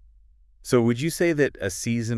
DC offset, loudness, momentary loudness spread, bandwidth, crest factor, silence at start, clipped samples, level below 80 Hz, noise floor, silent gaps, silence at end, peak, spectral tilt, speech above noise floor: under 0.1%; -23 LUFS; 7 LU; 12 kHz; 18 dB; 0.65 s; under 0.1%; -52 dBFS; -55 dBFS; none; 0 s; -6 dBFS; -5.5 dB/octave; 32 dB